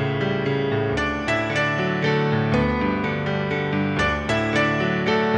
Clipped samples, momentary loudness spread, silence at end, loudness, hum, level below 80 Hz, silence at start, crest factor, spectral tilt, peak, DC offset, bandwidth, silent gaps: under 0.1%; 3 LU; 0 s; -22 LUFS; none; -40 dBFS; 0 s; 14 dB; -6.5 dB/octave; -8 dBFS; under 0.1%; 9.8 kHz; none